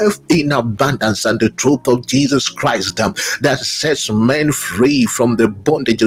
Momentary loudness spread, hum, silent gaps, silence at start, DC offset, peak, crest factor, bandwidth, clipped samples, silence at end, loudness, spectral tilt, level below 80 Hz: 3 LU; none; none; 0 s; under 0.1%; 0 dBFS; 14 dB; 16.5 kHz; under 0.1%; 0 s; -15 LUFS; -4.5 dB/octave; -46 dBFS